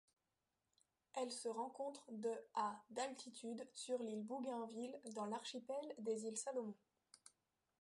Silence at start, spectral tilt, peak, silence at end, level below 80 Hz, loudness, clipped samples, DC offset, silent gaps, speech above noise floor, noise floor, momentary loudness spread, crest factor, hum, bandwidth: 1.15 s; -3.5 dB/octave; -30 dBFS; 0.65 s; under -90 dBFS; -47 LUFS; under 0.1%; under 0.1%; none; over 43 dB; under -90 dBFS; 7 LU; 18 dB; none; 11.5 kHz